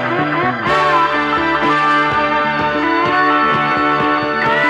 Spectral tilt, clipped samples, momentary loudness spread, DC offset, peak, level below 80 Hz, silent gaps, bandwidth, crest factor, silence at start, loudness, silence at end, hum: -5.5 dB/octave; under 0.1%; 3 LU; under 0.1%; -2 dBFS; -44 dBFS; none; 10.5 kHz; 12 dB; 0 s; -14 LUFS; 0 s; none